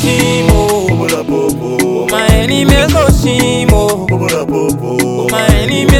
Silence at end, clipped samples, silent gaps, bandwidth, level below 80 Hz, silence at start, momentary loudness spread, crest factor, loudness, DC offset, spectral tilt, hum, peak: 0 s; under 0.1%; none; 18.5 kHz; -18 dBFS; 0 s; 5 LU; 10 dB; -11 LUFS; 0.1%; -5 dB/octave; none; 0 dBFS